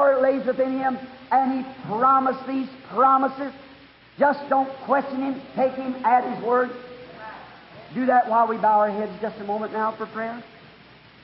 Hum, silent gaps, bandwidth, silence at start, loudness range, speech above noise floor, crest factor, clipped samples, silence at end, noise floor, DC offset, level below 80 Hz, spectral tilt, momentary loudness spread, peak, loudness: none; none; 5.8 kHz; 0 s; 2 LU; 27 dB; 16 dB; under 0.1%; 0.75 s; -49 dBFS; under 0.1%; -66 dBFS; -10 dB/octave; 15 LU; -6 dBFS; -23 LUFS